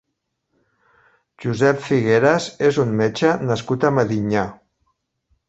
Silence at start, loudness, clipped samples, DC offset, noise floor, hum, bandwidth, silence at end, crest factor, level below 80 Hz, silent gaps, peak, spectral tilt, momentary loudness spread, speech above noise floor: 1.4 s; -19 LUFS; under 0.1%; under 0.1%; -76 dBFS; none; 8.2 kHz; 0.95 s; 18 dB; -54 dBFS; none; -2 dBFS; -6.5 dB/octave; 7 LU; 58 dB